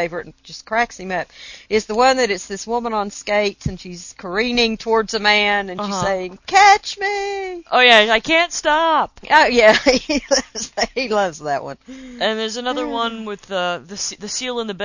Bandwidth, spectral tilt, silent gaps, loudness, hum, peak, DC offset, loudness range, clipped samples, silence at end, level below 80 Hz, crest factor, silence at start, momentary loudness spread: 8 kHz; -2.5 dB/octave; none; -17 LUFS; none; 0 dBFS; under 0.1%; 8 LU; under 0.1%; 0 s; -46 dBFS; 18 dB; 0 s; 15 LU